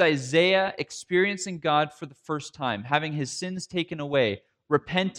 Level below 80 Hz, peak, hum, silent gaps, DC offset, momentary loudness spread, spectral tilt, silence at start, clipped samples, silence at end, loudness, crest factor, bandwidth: -66 dBFS; -6 dBFS; none; none; under 0.1%; 12 LU; -4.5 dB/octave; 0 s; under 0.1%; 0 s; -26 LUFS; 20 dB; 11 kHz